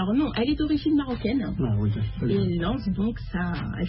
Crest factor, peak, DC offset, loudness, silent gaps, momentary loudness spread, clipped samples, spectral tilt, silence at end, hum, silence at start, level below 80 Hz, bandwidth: 12 dB; -12 dBFS; under 0.1%; -26 LUFS; none; 5 LU; under 0.1%; -12 dB/octave; 0 s; none; 0 s; -38 dBFS; 5.8 kHz